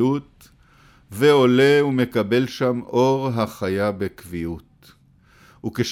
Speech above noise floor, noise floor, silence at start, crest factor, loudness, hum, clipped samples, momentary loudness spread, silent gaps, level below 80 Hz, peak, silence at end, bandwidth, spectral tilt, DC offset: 35 dB; -54 dBFS; 0 s; 16 dB; -20 LUFS; none; under 0.1%; 16 LU; none; -54 dBFS; -4 dBFS; 0 s; 16 kHz; -6 dB/octave; under 0.1%